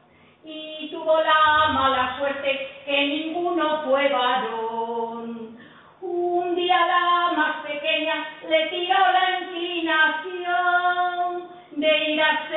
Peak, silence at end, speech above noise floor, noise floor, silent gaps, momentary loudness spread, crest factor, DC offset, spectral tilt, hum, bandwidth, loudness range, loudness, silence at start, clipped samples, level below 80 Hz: -8 dBFS; 0 s; 27 dB; -48 dBFS; none; 13 LU; 16 dB; under 0.1%; -7.5 dB/octave; none; 4.2 kHz; 3 LU; -22 LUFS; 0.45 s; under 0.1%; -62 dBFS